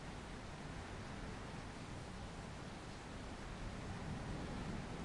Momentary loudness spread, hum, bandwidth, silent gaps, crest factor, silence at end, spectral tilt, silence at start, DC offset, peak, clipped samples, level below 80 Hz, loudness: 4 LU; none; 11.5 kHz; none; 14 dB; 0 s; -5.5 dB/octave; 0 s; under 0.1%; -34 dBFS; under 0.1%; -54 dBFS; -49 LUFS